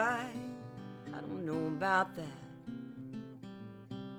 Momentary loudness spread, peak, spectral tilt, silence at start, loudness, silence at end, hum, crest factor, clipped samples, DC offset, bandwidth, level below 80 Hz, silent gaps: 18 LU; -18 dBFS; -6 dB/octave; 0 s; -38 LUFS; 0 s; none; 20 dB; under 0.1%; under 0.1%; over 20 kHz; -72 dBFS; none